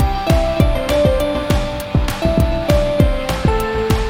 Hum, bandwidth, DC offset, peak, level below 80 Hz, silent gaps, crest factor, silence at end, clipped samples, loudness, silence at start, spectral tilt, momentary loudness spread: none; 17.5 kHz; under 0.1%; 0 dBFS; -20 dBFS; none; 14 dB; 0 s; under 0.1%; -17 LUFS; 0 s; -6.5 dB/octave; 4 LU